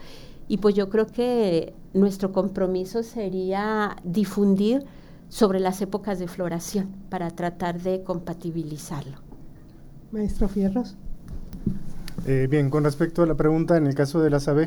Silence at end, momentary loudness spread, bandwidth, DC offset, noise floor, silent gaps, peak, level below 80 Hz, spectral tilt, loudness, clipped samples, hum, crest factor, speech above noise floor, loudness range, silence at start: 0 s; 14 LU; over 20 kHz; under 0.1%; -44 dBFS; none; -6 dBFS; -40 dBFS; -7 dB/octave; -25 LUFS; under 0.1%; none; 18 dB; 21 dB; 7 LU; 0 s